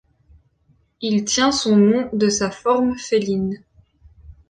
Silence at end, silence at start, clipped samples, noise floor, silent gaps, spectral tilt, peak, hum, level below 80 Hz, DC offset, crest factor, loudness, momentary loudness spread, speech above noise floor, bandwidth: 0.2 s; 1 s; under 0.1%; -61 dBFS; none; -4.5 dB/octave; -4 dBFS; none; -52 dBFS; under 0.1%; 16 dB; -19 LUFS; 9 LU; 42 dB; 9.6 kHz